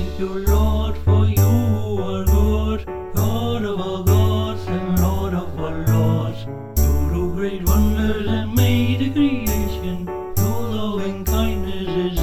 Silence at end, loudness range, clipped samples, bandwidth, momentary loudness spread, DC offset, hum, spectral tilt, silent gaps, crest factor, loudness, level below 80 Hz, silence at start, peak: 0 s; 2 LU; under 0.1%; 18.5 kHz; 8 LU; 0.7%; none; -6.5 dB/octave; none; 14 dB; -20 LUFS; -24 dBFS; 0 s; -4 dBFS